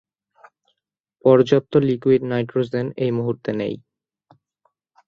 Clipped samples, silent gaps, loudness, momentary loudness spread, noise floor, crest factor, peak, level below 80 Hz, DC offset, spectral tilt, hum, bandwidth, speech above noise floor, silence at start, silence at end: under 0.1%; none; -20 LUFS; 10 LU; -79 dBFS; 20 dB; -2 dBFS; -60 dBFS; under 0.1%; -8.5 dB/octave; none; 6.8 kHz; 61 dB; 1.25 s; 1.3 s